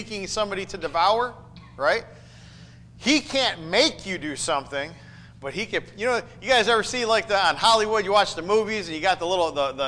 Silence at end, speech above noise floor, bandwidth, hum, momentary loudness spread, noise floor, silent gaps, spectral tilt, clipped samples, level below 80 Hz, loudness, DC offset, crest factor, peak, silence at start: 0 s; 23 dB; 10.5 kHz; none; 11 LU; -46 dBFS; none; -2.5 dB/octave; under 0.1%; -52 dBFS; -23 LUFS; under 0.1%; 16 dB; -8 dBFS; 0 s